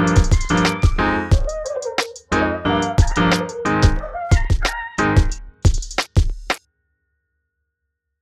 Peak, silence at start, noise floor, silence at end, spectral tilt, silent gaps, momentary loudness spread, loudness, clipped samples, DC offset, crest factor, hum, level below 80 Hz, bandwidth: -2 dBFS; 0 s; -77 dBFS; 1.65 s; -5.5 dB/octave; none; 8 LU; -19 LUFS; under 0.1%; under 0.1%; 18 dB; none; -22 dBFS; 13 kHz